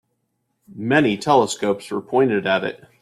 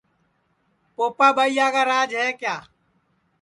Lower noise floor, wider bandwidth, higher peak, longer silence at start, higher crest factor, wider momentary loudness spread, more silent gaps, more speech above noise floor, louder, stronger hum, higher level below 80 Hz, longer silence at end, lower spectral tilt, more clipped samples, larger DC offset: first, -72 dBFS vs -67 dBFS; first, 13 kHz vs 11.5 kHz; about the same, -2 dBFS vs -2 dBFS; second, 0.7 s vs 1 s; about the same, 18 dB vs 20 dB; second, 8 LU vs 12 LU; neither; first, 53 dB vs 47 dB; about the same, -19 LUFS vs -20 LUFS; neither; first, -62 dBFS vs -72 dBFS; second, 0.25 s vs 0.8 s; first, -5 dB/octave vs -2 dB/octave; neither; neither